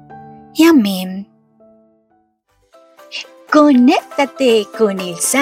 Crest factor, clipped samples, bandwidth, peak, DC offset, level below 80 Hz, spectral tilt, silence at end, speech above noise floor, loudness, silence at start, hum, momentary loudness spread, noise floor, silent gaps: 16 dB; under 0.1%; 16 kHz; 0 dBFS; under 0.1%; -62 dBFS; -4 dB/octave; 0 s; 48 dB; -13 LUFS; 0.1 s; none; 18 LU; -60 dBFS; none